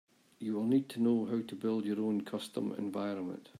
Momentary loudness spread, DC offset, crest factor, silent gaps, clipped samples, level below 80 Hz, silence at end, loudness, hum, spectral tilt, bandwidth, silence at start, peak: 8 LU; under 0.1%; 16 dB; none; under 0.1%; -82 dBFS; 0.15 s; -35 LUFS; none; -7 dB/octave; 14 kHz; 0.4 s; -18 dBFS